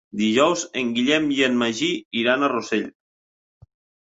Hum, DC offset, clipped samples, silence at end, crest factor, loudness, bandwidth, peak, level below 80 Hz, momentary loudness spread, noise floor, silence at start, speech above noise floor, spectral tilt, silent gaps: none; under 0.1%; under 0.1%; 1.15 s; 20 dB; -21 LUFS; 8 kHz; -4 dBFS; -64 dBFS; 6 LU; under -90 dBFS; 0.15 s; over 69 dB; -3.5 dB/octave; 2.05-2.11 s